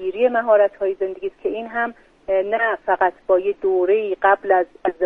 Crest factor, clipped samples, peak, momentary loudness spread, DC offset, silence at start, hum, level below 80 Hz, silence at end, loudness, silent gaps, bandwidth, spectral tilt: 16 dB; under 0.1%; -2 dBFS; 10 LU; under 0.1%; 0 s; none; -58 dBFS; 0 s; -20 LUFS; none; 3.9 kHz; -7 dB/octave